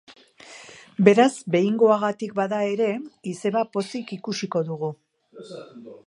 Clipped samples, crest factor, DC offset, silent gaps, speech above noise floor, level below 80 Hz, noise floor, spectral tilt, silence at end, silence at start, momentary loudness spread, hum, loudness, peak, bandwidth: under 0.1%; 22 dB; under 0.1%; none; 24 dB; -74 dBFS; -46 dBFS; -6 dB/octave; 0.1 s; 0.1 s; 22 LU; none; -23 LUFS; -2 dBFS; 11 kHz